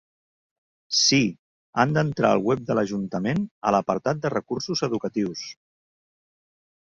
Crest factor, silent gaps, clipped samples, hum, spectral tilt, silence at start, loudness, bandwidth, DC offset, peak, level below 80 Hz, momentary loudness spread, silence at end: 22 dB; 1.39-1.73 s, 3.51-3.61 s; under 0.1%; none; -4.5 dB/octave; 0.9 s; -24 LUFS; 7.8 kHz; under 0.1%; -4 dBFS; -60 dBFS; 9 LU; 1.4 s